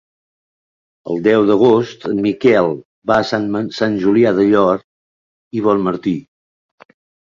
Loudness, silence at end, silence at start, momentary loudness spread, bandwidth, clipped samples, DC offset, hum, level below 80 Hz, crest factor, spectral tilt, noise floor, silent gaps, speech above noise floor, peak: -15 LUFS; 1 s; 1.05 s; 10 LU; 7.4 kHz; under 0.1%; under 0.1%; none; -54 dBFS; 16 dB; -7 dB/octave; under -90 dBFS; 2.85-3.02 s, 4.84-5.51 s; over 76 dB; -2 dBFS